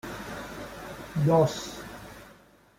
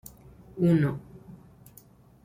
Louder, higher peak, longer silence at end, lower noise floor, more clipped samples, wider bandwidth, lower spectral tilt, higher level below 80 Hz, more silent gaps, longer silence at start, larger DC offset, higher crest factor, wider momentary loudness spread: second, -28 LUFS vs -25 LUFS; about the same, -10 dBFS vs -12 dBFS; second, 0.45 s vs 0.9 s; about the same, -56 dBFS vs -55 dBFS; neither; about the same, 16.5 kHz vs 16 kHz; second, -6.5 dB/octave vs -8.5 dB/octave; about the same, -54 dBFS vs -58 dBFS; neither; second, 0.05 s vs 0.55 s; neither; about the same, 20 dB vs 18 dB; second, 21 LU vs 25 LU